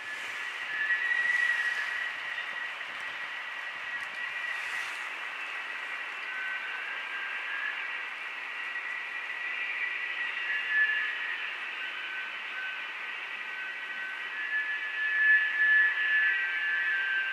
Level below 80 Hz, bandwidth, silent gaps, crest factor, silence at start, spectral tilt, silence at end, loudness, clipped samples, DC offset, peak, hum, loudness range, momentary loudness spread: under -90 dBFS; 14 kHz; none; 18 dB; 0 s; 1 dB/octave; 0 s; -30 LUFS; under 0.1%; under 0.1%; -14 dBFS; none; 8 LU; 11 LU